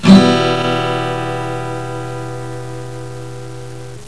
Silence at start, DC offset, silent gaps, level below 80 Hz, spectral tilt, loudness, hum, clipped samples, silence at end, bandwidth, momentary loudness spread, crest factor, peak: 0 s; 2%; none; -42 dBFS; -6.5 dB/octave; -17 LUFS; none; 0.4%; 0 s; 11 kHz; 18 LU; 16 dB; 0 dBFS